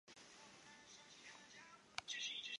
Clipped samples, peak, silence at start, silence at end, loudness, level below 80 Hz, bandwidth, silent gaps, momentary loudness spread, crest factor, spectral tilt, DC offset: under 0.1%; -22 dBFS; 0.05 s; 0 s; -52 LUFS; -88 dBFS; 11 kHz; none; 16 LU; 32 dB; 0.5 dB/octave; under 0.1%